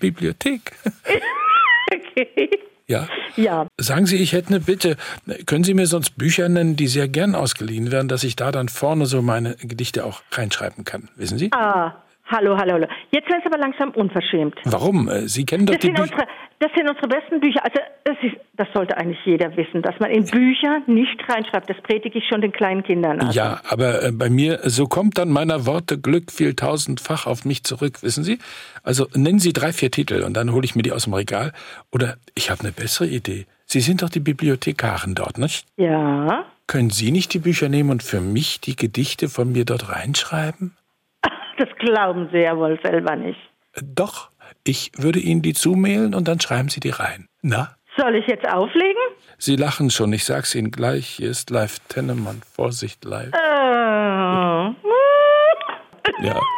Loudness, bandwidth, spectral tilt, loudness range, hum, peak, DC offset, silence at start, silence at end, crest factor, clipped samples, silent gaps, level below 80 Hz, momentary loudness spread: -20 LUFS; 17 kHz; -5 dB/octave; 3 LU; none; -6 dBFS; under 0.1%; 0 s; 0 s; 14 dB; under 0.1%; none; -58 dBFS; 9 LU